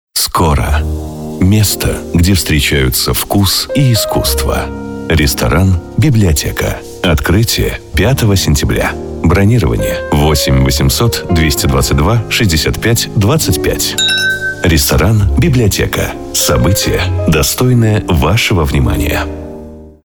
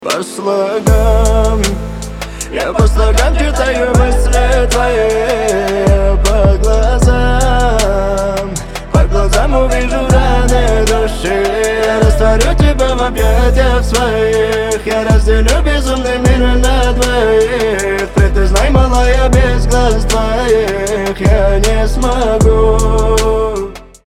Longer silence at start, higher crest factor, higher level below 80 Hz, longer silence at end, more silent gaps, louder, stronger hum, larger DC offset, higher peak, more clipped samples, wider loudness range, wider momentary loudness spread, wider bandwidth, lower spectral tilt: first, 0.15 s vs 0 s; about the same, 10 dB vs 10 dB; second, -20 dBFS vs -14 dBFS; about the same, 0.15 s vs 0.25 s; neither; about the same, -11 LUFS vs -12 LUFS; neither; neither; about the same, -2 dBFS vs 0 dBFS; neither; about the same, 1 LU vs 1 LU; about the same, 6 LU vs 5 LU; first, over 20 kHz vs 15 kHz; about the same, -4.5 dB/octave vs -5 dB/octave